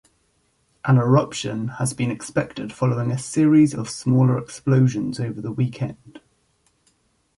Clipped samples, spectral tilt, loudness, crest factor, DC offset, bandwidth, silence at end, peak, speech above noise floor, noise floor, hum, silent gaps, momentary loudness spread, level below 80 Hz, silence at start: under 0.1%; -7 dB/octave; -21 LUFS; 18 dB; under 0.1%; 11.5 kHz; 1.2 s; -4 dBFS; 45 dB; -66 dBFS; none; none; 11 LU; -58 dBFS; 0.85 s